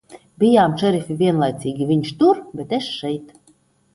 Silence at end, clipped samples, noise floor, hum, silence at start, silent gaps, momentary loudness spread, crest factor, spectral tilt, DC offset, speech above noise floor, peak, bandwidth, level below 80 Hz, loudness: 0.7 s; under 0.1%; -57 dBFS; none; 0.1 s; none; 10 LU; 16 dB; -7 dB/octave; under 0.1%; 39 dB; -4 dBFS; 11.5 kHz; -58 dBFS; -19 LUFS